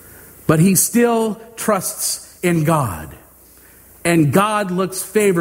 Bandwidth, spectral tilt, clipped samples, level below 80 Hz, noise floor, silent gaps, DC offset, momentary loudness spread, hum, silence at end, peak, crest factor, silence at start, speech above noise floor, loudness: 16.5 kHz; -5 dB/octave; under 0.1%; -48 dBFS; -46 dBFS; none; under 0.1%; 10 LU; none; 0 s; 0 dBFS; 18 dB; 0.15 s; 30 dB; -17 LUFS